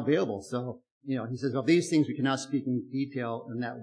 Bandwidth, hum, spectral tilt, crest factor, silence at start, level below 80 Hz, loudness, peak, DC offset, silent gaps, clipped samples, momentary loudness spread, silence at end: 10.5 kHz; none; -6 dB/octave; 18 dB; 0 s; -78 dBFS; -30 LUFS; -12 dBFS; under 0.1%; 0.91-1.01 s; under 0.1%; 10 LU; 0 s